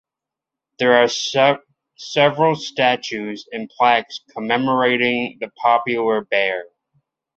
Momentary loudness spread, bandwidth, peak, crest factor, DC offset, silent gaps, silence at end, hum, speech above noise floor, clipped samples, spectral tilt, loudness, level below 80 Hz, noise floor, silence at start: 13 LU; 8 kHz; -2 dBFS; 18 dB; under 0.1%; none; 0.7 s; none; 68 dB; under 0.1%; -4 dB/octave; -18 LUFS; -66 dBFS; -86 dBFS; 0.8 s